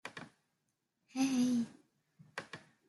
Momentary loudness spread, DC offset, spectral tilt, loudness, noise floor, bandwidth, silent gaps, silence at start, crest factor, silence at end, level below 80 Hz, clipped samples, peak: 20 LU; under 0.1%; -4 dB/octave; -36 LUFS; -84 dBFS; 12 kHz; none; 0.05 s; 16 dB; 0.3 s; -84 dBFS; under 0.1%; -22 dBFS